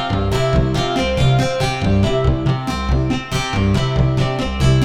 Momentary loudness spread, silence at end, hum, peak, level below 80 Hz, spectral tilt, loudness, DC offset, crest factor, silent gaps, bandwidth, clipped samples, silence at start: 4 LU; 0 s; none; -4 dBFS; -24 dBFS; -6 dB/octave; -18 LUFS; under 0.1%; 12 dB; none; 12 kHz; under 0.1%; 0 s